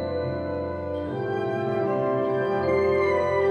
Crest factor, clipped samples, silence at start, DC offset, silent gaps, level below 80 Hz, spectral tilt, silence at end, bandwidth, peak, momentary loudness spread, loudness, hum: 12 dB; under 0.1%; 0 s; under 0.1%; none; -52 dBFS; -8 dB/octave; 0 s; 6.8 kHz; -12 dBFS; 8 LU; -25 LUFS; none